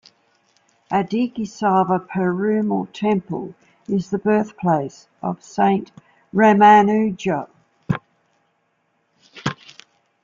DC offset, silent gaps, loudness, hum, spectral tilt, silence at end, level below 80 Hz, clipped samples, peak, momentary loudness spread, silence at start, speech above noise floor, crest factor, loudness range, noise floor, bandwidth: under 0.1%; none; -19 LUFS; none; -7 dB/octave; 0.7 s; -60 dBFS; under 0.1%; -2 dBFS; 16 LU; 0.9 s; 49 dB; 18 dB; 5 LU; -67 dBFS; 7.6 kHz